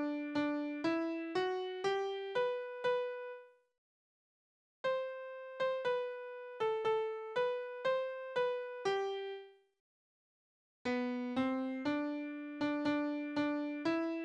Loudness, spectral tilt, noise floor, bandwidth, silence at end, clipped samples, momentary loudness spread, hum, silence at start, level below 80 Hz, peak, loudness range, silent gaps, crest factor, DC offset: -38 LUFS; -5 dB/octave; under -90 dBFS; 9 kHz; 0 s; under 0.1%; 8 LU; none; 0 s; -80 dBFS; -24 dBFS; 4 LU; 3.78-4.84 s, 9.80-10.85 s; 14 dB; under 0.1%